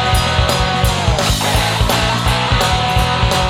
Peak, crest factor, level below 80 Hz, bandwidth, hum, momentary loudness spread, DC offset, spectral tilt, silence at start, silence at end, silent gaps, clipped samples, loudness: -2 dBFS; 12 dB; -22 dBFS; 16.5 kHz; none; 1 LU; under 0.1%; -4 dB/octave; 0 s; 0 s; none; under 0.1%; -14 LUFS